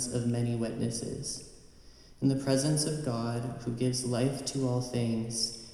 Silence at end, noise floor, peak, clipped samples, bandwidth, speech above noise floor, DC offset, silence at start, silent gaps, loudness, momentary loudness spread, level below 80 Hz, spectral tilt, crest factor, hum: 0 s; -54 dBFS; -14 dBFS; under 0.1%; 14 kHz; 23 dB; under 0.1%; 0 s; none; -31 LUFS; 8 LU; -56 dBFS; -5 dB/octave; 18 dB; none